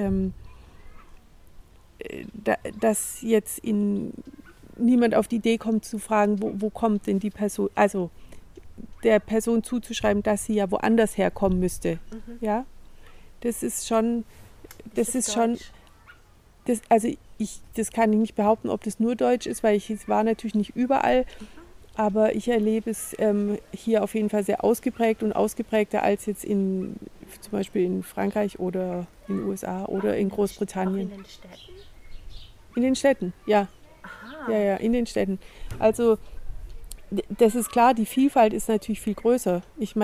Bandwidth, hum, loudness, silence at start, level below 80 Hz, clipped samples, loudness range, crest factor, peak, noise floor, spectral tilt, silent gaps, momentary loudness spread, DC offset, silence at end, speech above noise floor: 16 kHz; none; -25 LUFS; 0 s; -46 dBFS; under 0.1%; 5 LU; 18 dB; -6 dBFS; -54 dBFS; -5.5 dB/octave; none; 13 LU; under 0.1%; 0 s; 30 dB